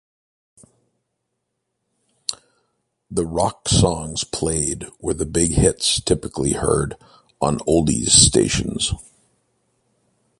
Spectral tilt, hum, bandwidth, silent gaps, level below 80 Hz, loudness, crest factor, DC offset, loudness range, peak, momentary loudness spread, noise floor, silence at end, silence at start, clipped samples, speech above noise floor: -3.5 dB/octave; none; 11.5 kHz; none; -36 dBFS; -19 LUFS; 22 dB; under 0.1%; 10 LU; 0 dBFS; 14 LU; -76 dBFS; 1.35 s; 2.3 s; under 0.1%; 57 dB